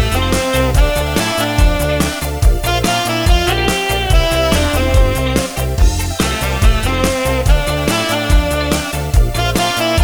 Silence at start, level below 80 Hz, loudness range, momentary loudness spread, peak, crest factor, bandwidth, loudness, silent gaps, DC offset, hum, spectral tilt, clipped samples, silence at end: 0 s; -16 dBFS; 1 LU; 3 LU; 0 dBFS; 12 dB; over 20 kHz; -15 LUFS; none; under 0.1%; none; -4.5 dB/octave; under 0.1%; 0 s